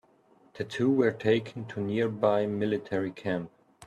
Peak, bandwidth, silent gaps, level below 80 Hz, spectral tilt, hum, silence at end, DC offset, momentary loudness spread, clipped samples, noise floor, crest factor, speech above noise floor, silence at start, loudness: -12 dBFS; 10.5 kHz; none; -68 dBFS; -7.5 dB/octave; none; 0 s; under 0.1%; 11 LU; under 0.1%; -62 dBFS; 18 dB; 34 dB; 0.55 s; -29 LUFS